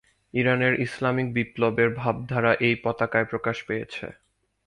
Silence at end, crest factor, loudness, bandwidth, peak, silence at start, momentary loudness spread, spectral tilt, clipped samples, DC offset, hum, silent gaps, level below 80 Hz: 0.55 s; 20 dB; -24 LUFS; 11 kHz; -6 dBFS; 0.35 s; 10 LU; -7 dB/octave; under 0.1%; under 0.1%; none; none; -58 dBFS